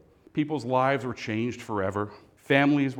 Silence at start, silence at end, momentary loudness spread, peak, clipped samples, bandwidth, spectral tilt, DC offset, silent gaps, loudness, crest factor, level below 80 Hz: 0.35 s; 0 s; 11 LU; -6 dBFS; under 0.1%; 10.5 kHz; -6.5 dB/octave; under 0.1%; none; -27 LUFS; 20 dB; -68 dBFS